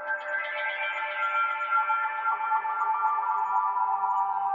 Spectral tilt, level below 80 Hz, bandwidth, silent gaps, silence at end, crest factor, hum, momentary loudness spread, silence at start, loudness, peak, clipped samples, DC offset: -1 dB/octave; under -90 dBFS; 7.4 kHz; none; 0 s; 14 dB; none; 4 LU; 0 s; -27 LUFS; -14 dBFS; under 0.1%; under 0.1%